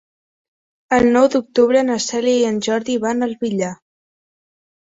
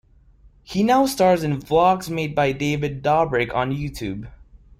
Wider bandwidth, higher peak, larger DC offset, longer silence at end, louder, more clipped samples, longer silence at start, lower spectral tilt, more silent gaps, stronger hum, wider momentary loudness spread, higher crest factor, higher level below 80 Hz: second, 8 kHz vs 16 kHz; about the same, -2 dBFS vs -4 dBFS; neither; first, 1.1 s vs 0.35 s; first, -17 LUFS vs -21 LUFS; neither; first, 0.9 s vs 0.7 s; second, -4.5 dB/octave vs -6 dB/octave; neither; neither; second, 8 LU vs 11 LU; about the same, 16 dB vs 16 dB; second, -52 dBFS vs -46 dBFS